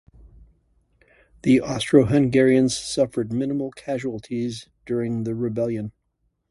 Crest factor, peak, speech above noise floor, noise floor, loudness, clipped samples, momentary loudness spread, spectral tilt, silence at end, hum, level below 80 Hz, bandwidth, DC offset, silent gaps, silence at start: 20 dB; -2 dBFS; 50 dB; -72 dBFS; -22 LUFS; under 0.1%; 12 LU; -6 dB/octave; 0.6 s; none; -52 dBFS; 11.5 kHz; under 0.1%; none; 1.45 s